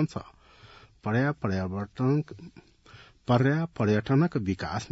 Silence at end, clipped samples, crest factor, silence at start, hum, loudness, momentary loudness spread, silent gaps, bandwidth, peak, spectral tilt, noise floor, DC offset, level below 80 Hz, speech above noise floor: 0.05 s; under 0.1%; 18 dB; 0 s; none; -27 LUFS; 15 LU; none; 8 kHz; -10 dBFS; -8 dB/octave; -53 dBFS; under 0.1%; -58 dBFS; 27 dB